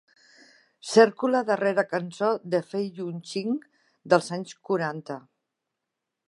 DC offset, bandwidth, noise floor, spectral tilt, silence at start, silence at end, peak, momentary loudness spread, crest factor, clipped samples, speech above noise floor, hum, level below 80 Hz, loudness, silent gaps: under 0.1%; 11.5 kHz; -84 dBFS; -5 dB/octave; 0.85 s; 1.1 s; -4 dBFS; 15 LU; 24 dB; under 0.1%; 59 dB; none; -82 dBFS; -25 LUFS; none